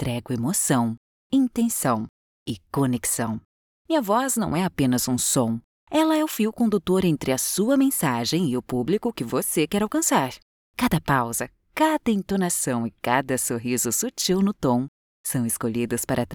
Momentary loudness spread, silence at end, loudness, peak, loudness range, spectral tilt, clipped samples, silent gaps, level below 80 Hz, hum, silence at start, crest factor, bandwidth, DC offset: 8 LU; 0 s; -23 LUFS; -6 dBFS; 2 LU; -4.5 dB/octave; under 0.1%; 0.97-1.30 s, 2.09-2.46 s, 3.45-3.85 s, 5.64-5.87 s, 10.42-10.74 s, 14.88-15.24 s; -52 dBFS; none; 0 s; 18 dB; over 20 kHz; under 0.1%